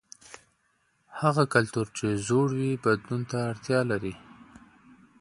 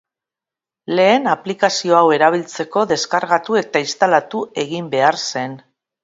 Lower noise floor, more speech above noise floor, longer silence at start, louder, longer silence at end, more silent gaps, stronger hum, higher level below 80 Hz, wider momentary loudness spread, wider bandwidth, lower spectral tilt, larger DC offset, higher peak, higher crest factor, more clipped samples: second, -71 dBFS vs -88 dBFS; second, 44 dB vs 72 dB; second, 0.3 s vs 0.9 s; second, -27 LUFS vs -17 LUFS; first, 0.75 s vs 0.45 s; neither; neither; first, -60 dBFS vs -68 dBFS; first, 21 LU vs 10 LU; first, 11.5 kHz vs 8 kHz; first, -6 dB/octave vs -4 dB/octave; neither; second, -6 dBFS vs 0 dBFS; about the same, 22 dB vs 18 dB; neither